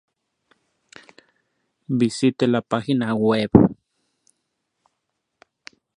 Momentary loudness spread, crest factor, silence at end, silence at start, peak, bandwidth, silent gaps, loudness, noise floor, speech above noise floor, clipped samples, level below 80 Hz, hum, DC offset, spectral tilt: 7 LU; 24 dB; 2.25 s; 1.9 s; 0 dBFS; 11 kHz; none; -20 LUFS; -77 dBFS; 59 dB; under 0.1%; -48 dBFS; none; under 0.1%; -7 dB/octave